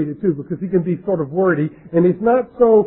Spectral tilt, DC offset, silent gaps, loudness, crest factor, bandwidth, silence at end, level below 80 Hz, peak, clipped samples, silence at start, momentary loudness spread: -13.5 dB/octave; under 0.1%; none; -18 LUFS; 14 dB; 3.9 kHz; 0 s; -52 dBFS; -4 dBFS; under 0.1%; 0 s; 6 LU